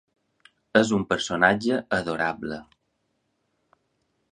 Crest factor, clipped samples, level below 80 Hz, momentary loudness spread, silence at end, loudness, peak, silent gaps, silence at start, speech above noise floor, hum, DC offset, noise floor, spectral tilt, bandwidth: 24 dB; under 0.1%; -58 dBFS; 13 LU; 1.7 s; -24 LUFS; -2 dBFS; none; 0.75 s; 51 dB; none; under 0.1%; -74 dBFS; -4.5 dB/octave; 11 kHz